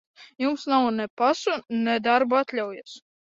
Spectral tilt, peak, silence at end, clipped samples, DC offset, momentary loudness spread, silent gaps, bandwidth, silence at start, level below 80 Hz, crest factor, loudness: -4.5 dB/octave; -6 dBFS; 0.25 s; under 0.1%; under 0.1%; 10 LU; 1.10-1.17 s; 7.8 kHz; 0.2 s; -72 dBFS; 18 dB; -24 LUFS